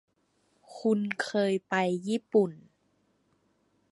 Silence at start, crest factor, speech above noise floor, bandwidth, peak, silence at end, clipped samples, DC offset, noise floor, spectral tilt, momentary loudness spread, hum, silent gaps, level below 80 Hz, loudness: 0.7 s; 20 dB; 44 dB; 11.5 kHz; -12 dBFS; 1.35 s; under 0.1%; under 0.1%; -72 dBFS; -6 dB/octave; 5 LU; none; none; -80 dBFS; -29 LUFS